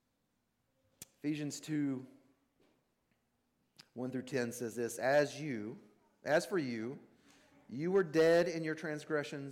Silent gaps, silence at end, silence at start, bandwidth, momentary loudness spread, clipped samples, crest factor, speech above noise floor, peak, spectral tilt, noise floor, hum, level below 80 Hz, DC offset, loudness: none; 0 s; 1 s; 16.5 kHz; 18 LU; under 0.1%; 18 dB; 46 dB; -20 dBFS; -5.5 dB/octave; -81 dBFS; none; -80 dBFS; under 0.1%; -36 LUFS